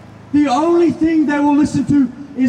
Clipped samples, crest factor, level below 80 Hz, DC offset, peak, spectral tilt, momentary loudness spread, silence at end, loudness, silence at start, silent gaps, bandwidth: under 0.1%; 10 dB; -48 dBFS; under 0.1%; -4 dBFS; -6.5 dB/octave; 3 LU; 0 s; -15 LUFS; 0.2 s; none; 9.6 kHz